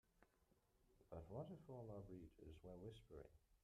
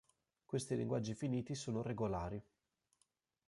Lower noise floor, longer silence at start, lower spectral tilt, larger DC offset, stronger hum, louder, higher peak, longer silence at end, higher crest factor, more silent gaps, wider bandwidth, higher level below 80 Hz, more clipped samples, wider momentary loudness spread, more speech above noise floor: about the same, -82 dBFS vs -83 dBFS; second, 0.15 s vs 0.5 s; first, -8 dB/octave vs -6.5 dB/octave; neither; neither; second, -59 LUFS vs -42 LUFS; second, -42 dBFS vs -26 dBFS; second, 0.05 s vs 1.05 s; about the same, 18 dB vs 18 dB; neither; first, 13 kHz vs 11.5 kHz; second, -72 dBFS vs -64 dBFS; neither; first, 8 LU vs 5 LU; second, 23 dB vs 42 dB